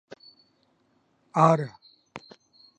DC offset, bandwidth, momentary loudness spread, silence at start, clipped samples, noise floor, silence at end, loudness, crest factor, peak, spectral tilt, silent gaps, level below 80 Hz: under 0.1%; 9.4 kHz; 25 LU; 1.35 s; under 0.1%; -68 dBFS; 0.6 s; -24 LUFS; 26 dB; -4 dBFS; -7.5 dB/octave; none; -76 dBFS